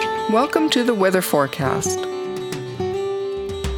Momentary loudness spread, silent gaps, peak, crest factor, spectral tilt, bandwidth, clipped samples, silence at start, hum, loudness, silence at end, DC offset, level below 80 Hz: 9 LU; none; -2 dBFS; 18 dB; -4.5 dB/octave; over 20 kHz; under 0.1%; 0 s; none; -21 LUFS; 0 s; under 0.1%; -40 dBFS